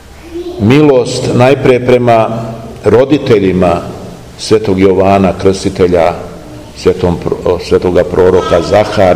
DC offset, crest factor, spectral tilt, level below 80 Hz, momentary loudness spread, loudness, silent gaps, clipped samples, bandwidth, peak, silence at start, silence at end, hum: 0.8%; 10 dB; -6.5 dB/octave; -34 dBFS; 16 LU; -9 LUFS; none; 4%; 14.5 kHz; 0 dBFS; 0.1 s; 0 s; none